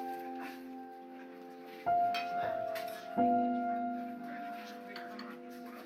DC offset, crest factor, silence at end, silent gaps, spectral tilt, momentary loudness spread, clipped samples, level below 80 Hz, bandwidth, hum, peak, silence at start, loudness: under 0.1%; 18 dB; 0 s; none; -5.5 dB/octave; 18 LU; under 0.1%; -78 dBFS; 16 kHz; none; -20 dBFS; 0 s; -37 LUFS